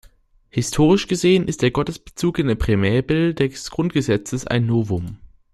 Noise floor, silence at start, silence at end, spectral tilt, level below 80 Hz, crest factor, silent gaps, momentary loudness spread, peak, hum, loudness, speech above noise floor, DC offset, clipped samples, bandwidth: -52 dBFS; 0.55 s; 0.3 s; -6 dB/octave; -38 dBFS; 16 dB; none; 9 LU; -4 dBFS; none; -20 LUFS; 33 dB; under 0.1%; under 0.1%; 13 kHz